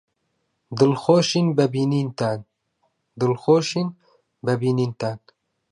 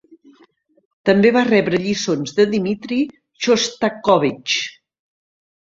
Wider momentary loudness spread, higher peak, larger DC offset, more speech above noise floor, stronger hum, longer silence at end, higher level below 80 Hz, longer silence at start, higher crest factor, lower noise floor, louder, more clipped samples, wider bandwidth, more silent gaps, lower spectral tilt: first, 12 LU vs 9 LU; about the same, -4 dBFS vs -2 dBFS; neither; first, 53 dB vs 38 dB; neither; second, 0.55 s vs 1.1 s; second, -66 dBFS vs -58 dBFS; second, 0.7 s vs 1.05 s; about the same, 18 dB vs 18 dB; first, -73 dBFS vs -55 dBFS; second, -21 LUFS vs -18 LUFS; neither; first, 11 kHz vs 7.8 kHz; neither; first, -6 dB/octave vs -4.5 dB/octave